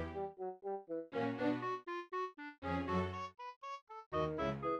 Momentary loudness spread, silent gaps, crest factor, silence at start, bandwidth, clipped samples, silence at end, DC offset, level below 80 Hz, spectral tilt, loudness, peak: 10 LU; 2.58-2.62 s, 3.56-3.61 s, 3.82-3.87 s, 4.06-4.11 s; 16 dB; 0 s; 9.2 kHz; under 0.1%; 0 s; under 0.1%; -62 dBFS; -7.5 dB/octave; -41 LUFS; -24 dBFS